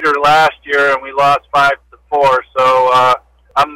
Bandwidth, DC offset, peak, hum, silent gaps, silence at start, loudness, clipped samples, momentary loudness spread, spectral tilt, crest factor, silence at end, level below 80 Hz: 16.5 kHz; under 0.1%; -4 dBFS; none; none; 0 s; -12 LUFS; under 0.1%; 8 LU; -3.5 dB/octave; 8 dB; 0 s; -48 dBFS